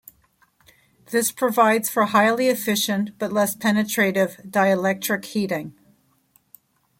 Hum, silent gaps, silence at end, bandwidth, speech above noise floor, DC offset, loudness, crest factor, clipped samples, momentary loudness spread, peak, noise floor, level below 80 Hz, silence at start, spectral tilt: none; none; 1.3 s; 17 kHz; 41 dB; under 0.1%; -21 LUFS; 20 dB; under 0.1%; 7 LU; -4 dBFS; -62 dBFS; -66 dBFS; 1.1 s; -4 dB/octave